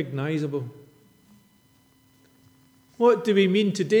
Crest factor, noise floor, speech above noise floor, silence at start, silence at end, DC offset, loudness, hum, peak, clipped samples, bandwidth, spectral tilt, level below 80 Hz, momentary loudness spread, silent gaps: 18 dB; -60 dBFS; 38 dB; 0 s; 0 s; under 0.1%; -23 LUFS; none; -8 dBFS; under 0.1%; 13 kHz; -6.5 dB/octave; -76 dBFS; 12 LU; none